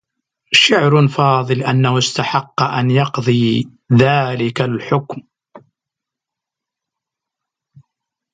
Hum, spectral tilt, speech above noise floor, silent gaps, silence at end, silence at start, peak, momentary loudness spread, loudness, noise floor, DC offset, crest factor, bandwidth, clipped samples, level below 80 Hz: none; -5.5 dB/octave; 69 dB; none; 2.75 s; 0.5 s; 0 dBFS; 9 LU; -15 LUFS; -84 dBFS; under 0.1%; 16 dB; 9.4 kHz; under 0.1%; -56 dBFS